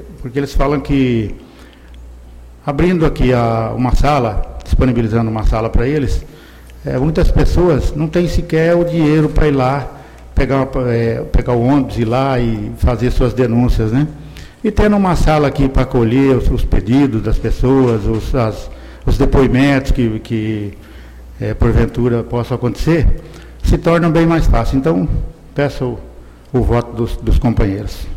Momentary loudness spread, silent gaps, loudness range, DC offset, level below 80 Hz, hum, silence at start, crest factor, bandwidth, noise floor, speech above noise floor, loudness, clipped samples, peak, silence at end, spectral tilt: 10 LU; none; 3 LU; under 0.1%; -20 dBFS; none; 0 s; 12 dB; 14 kHz; -37 dBFS; 24 dB; -15 LUFS; under 0.1%; -2 dBFS; 0 s; -8 dB/octave